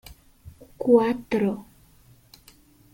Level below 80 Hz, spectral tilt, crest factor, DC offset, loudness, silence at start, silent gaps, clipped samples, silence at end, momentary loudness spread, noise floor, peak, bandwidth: -56 dBFS; -7.5 dB/octave; 20 dB; under 0.1%; -23 LUFS; 0.45 s; none; under 0.1%; 1.3 s; 11 LU; -55 dBFS; -6 dBFS; 17 kHz